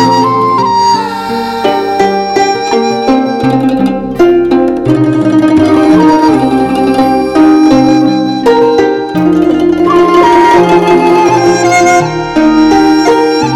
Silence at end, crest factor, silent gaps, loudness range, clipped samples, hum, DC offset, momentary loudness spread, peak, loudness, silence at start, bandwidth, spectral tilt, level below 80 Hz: 0 s; 8 dB; none; 3 LU; 1%; none; under 0.1%; 5 LU; 0 dBFS; -8 LUFS; 0 s; 13.5 kHz; -5.5 dB/octave; -38 dBFS